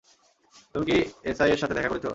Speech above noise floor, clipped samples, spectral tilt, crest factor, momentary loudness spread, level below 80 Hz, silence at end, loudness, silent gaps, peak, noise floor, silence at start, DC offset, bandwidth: 37 dB; under 0.1%; -5.5 dB/octave; 20 dB; 8 LU; -50 dBFS; 0 s; -26 LUFS; none; -8 dBFS; -62 dBFS; 0.75 s; under 0.1%; 8 kHz